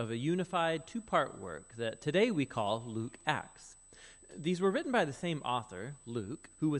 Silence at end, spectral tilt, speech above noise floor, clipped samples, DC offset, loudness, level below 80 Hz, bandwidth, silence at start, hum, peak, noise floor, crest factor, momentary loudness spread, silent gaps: 0 s; -5.5 dB/octave; 22 dB; under 0.1%; under 0.1%; -35 LUFS; -66 dBFS; 11.5 kHz; 0 s; none; -14 dBFS; -57 dBFS; 22 dB; 18 LU; none